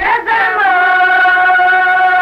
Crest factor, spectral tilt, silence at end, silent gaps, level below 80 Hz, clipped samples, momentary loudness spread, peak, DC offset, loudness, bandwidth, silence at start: 8 dB; -3 dB/octave; 0 s; none; -48 dBFS; under 0.1%; 3 LU; -2 dBFS; under 0.1%; -9 LUFS; 12.5 kHz; 0 s